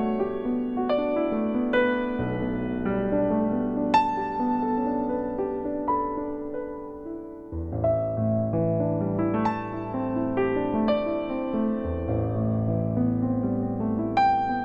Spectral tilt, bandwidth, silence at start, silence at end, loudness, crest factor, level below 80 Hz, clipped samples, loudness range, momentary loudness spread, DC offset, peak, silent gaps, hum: -9 dB/octave; 7.8 kHz; 0 s; 0 s; -26 LUFS; 16 dB; -46 dBFS; under 0.1%; 3 LU; 8 LU; under 0.1%; -8 dBFS; none; none